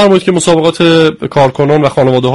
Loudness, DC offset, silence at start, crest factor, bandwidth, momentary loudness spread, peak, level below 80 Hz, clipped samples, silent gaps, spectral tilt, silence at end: -9 LUFS; 0.7%; 0 s; 8 dB; 11.5 kHz; 3 LU; 0 dBFS; -42 dBFS; 0.3%; none; -5.5 dB/octave; 0 s